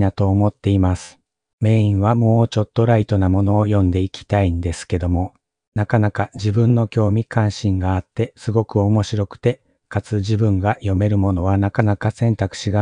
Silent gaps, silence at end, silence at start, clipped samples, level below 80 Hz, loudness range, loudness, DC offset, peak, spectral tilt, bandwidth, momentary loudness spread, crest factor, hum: 1.53-1.58 s, 5.68-5.72 s; 0 s; 0 s; under 0.1%; -46 dBFS; 3 LU; -19 LUFS; under 0.1%; -2 dBFS; -8 dB/octave; 10 kHz; 7 LU; 16 dB; none